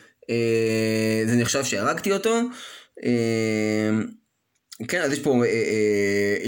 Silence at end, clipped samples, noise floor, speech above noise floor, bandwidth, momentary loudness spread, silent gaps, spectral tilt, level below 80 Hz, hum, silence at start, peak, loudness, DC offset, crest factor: 0 s; under 0.1%; -73 dBFS; 50 dB; 17 kHz; 8 LU; none; -5 dB/octave; -64 dBFS; none; 0.3 s; -8 dBFS; -23 LUFS; under 0.1%; 16 dB